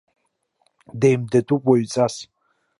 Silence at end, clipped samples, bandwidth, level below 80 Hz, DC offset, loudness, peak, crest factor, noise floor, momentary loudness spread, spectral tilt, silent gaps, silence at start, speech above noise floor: 0.55 s; under 0.1%; 11.5 kHz; -64 dBFS; under 0.1%; -20 LUFS; -4 dBFS; 18 dB; -70 dBFS; 11 LU; -6.5 dB/octave; none; 0.95 s; 51 dB